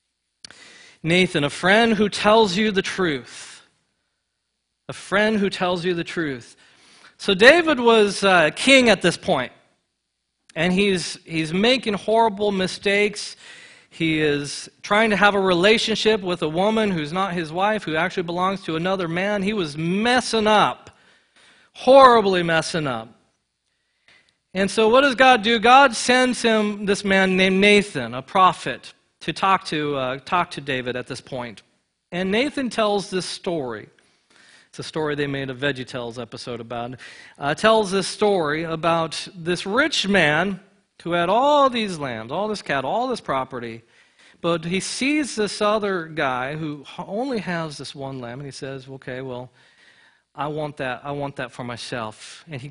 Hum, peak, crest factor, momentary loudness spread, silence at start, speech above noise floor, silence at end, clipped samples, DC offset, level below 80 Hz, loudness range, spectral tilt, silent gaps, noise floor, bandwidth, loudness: none; 0 dBFS; 22 dB; 17 LU; 1.05 s; 56 dB; 0 s; under 0.1%; under 0.1%; -54 dBFS; 11 LU; -4.5 dB/octave; none; -76 dBFS; 11 kHz; -20 LUFS